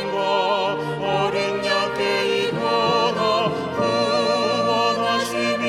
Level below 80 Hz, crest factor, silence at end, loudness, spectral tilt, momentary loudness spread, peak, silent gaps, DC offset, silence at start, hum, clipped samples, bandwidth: -58 dBFS; 14 dB; 0 s; -20 LUFS; -4 dB/octave; 3 LU; -6 dBFS; none; under 0.1%; 0 s; none; under 0.1%; 15.5 kHz